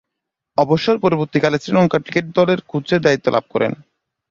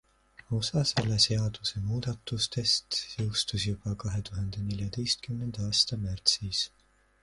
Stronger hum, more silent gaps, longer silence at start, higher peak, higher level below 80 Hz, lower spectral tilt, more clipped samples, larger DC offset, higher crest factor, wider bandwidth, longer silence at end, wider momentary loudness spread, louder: neither; neither; about the same, 0.6 s vs 0.5 s; first, -2 dBFS vs -8 dBFS; about the same, -54 dBFS vs -50 dBFS; first, -6.5 dB/octave vs -4 dB/octave; neither; neither; second, 16 dB vs 22 dB; second, 7.4 kHz vs 11.5 kHz; about the same, 0.55 s vs 0.55 s; second, 5 LU vs 9 LU; first, -17 LUFS vs -29 LUFS